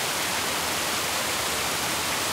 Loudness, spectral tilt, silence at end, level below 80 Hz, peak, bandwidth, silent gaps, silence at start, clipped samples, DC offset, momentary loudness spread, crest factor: -25 LUFS; -1 dB/octave; 0 s; -54 dBFS; -14 dBFS; 16 kHz; none; 0 s; under 0.1%; under 0.1%; 0 LU; 14 dB